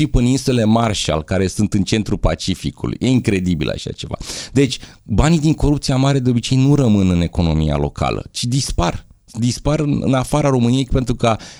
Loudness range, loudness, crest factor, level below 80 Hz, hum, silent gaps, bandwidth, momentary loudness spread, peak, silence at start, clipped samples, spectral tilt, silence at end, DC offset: 3 LU; -17 LUFS; 16 dB; -28 dBFS; none; none; over 20 kHz; 8 LU; 0 dBFS; 0 s; under 0.1%; -6 dB/octave; 0.05 s; under 0.1%